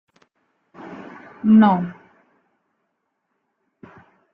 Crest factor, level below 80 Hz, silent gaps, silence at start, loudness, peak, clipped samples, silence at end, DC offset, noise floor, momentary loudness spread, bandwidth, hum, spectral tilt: 20 dB; -66 dBFS; none; 0.85 s; -17 LUFS; -4 dBFS; under 0.1%; 2.4 s; under 0.1%; -74 dBFS; 26 LU; 4 kHz; none; -10 dB/octave